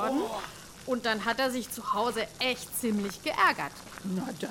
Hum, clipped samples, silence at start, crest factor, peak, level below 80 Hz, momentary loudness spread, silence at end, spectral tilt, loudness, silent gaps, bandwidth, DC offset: none; under 0.1%; 0 s; 20 dB; -12 dBFS; -60 dBFS; 12 LU; 0 s; -3.5 dB/octave; -30 LUFS; none; 17 kHz; under 0.1%